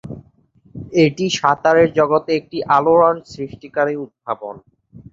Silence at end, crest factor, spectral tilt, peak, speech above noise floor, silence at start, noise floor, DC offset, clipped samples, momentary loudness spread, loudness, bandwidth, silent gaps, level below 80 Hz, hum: 0.1 s; 18 dB; -5.5 dB/octave; 0 dBFS; 37 dB; 0.05 s; -53 dBFS; under 0.1%; under 0.1%; 17 LU; -17 LUFS; 7.6 kHz; none; -54 dBFS; none